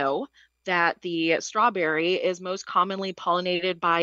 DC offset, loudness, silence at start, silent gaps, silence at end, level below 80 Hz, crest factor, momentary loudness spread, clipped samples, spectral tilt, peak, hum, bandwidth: under 0.1%; -25 LUFS; 0 s; none; 0 s; -76 dBFS; 18 dB; 8 LU; under 0.1%; -4 dB/octave; -8 dBFS; none; 8 kHz